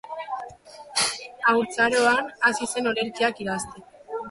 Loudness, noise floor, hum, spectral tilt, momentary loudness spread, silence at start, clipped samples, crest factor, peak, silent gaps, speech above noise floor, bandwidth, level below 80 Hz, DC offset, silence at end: -24 LUFS; -44 dBFS; none; -2 dB/octave; 15 LU; 0.05 s; under 0.1%; 18 dB; -8 dBFS; none; 20 dB; 11.5 kHz; -62 dBFS; under 0.1%; 0 s